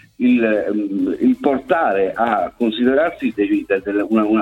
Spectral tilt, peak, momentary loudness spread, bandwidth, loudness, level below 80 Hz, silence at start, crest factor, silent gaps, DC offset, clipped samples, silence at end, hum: -7.5 dB/octave; -2 dBFS; 4 LU; 4.5 kHz; -18 LUFS; -52 dBFS; 0.2 s; 14 dB; none; under 0.1%; under 0.1%; 0 s; none